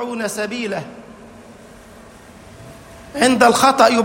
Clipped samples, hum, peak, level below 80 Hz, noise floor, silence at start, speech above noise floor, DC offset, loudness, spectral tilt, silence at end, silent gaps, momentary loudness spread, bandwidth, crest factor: under 0.1%; none; 0 dBFS; -52 dBFS; -42 dBFS; 0 s; 26 dB; under 0.1%; -16 LUFS; -3 dB/octave; 0 s; none; 24 LU; 16.5 kHz; 18 dB